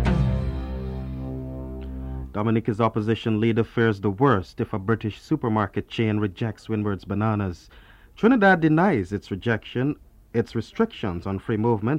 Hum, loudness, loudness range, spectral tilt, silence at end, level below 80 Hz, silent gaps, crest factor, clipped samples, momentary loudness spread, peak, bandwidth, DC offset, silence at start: none; -24 LUFS; 4 LU; -8 dB/octave; 0 s; -38 dBFS; none; 18 dB; under 0.1%; 12 LU; -6 dBFS; 9.4 kHz; under 0.1%; 0 s